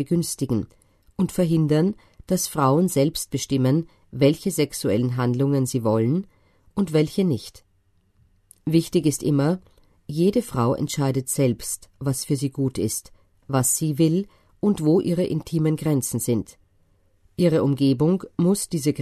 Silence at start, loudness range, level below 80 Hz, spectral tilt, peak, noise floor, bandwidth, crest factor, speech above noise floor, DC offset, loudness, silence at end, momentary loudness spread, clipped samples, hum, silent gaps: 0 s; 3 LU; -52 dBFS; -6 dB/octave; -6 dBFS; -63 dBFS; 13.5 kHz; 18 dB; 42 dB; under 0.1%; -23 LUFS; 0 s; 8 LU; under 0.1%; none; none